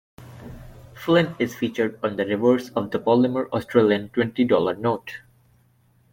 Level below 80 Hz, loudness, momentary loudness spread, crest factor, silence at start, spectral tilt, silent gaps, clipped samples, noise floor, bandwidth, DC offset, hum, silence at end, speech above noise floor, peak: -56 dBFS; -22 LUFS; 19 LU; 18 dB; 0.2 s; -7 dB/octave; none; under 0.1%; -60 dBFS; 17 kHz; under 0.1%; none; 0.95 s; 39 dB; -4 dBFS